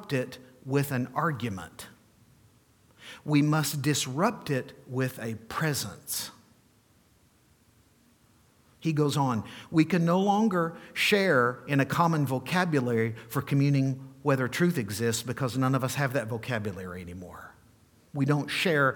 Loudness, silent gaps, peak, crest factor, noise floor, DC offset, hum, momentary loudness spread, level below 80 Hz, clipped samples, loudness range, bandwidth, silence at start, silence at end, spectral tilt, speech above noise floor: -28 LUFS; none; -10 dBFS; 20 dB; -63 dBFS; under 0.1%; none; 15 LU; -66 dBFS; under 0.1%; 9 LU; 19 kHz; 0 s; 0 s; -5.5 dB/octave; 36 dB